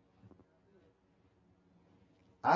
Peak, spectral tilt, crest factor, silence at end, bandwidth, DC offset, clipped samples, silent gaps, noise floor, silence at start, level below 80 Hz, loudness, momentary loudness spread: -14 dBFS; -4 dB/octave; 26 dB; 0 s; 7.2 kHz; under 0.1%; under 0.1%; none; -71 dBFS; 2.45 s; -76 dBFS; -37 LUFS; 14 LU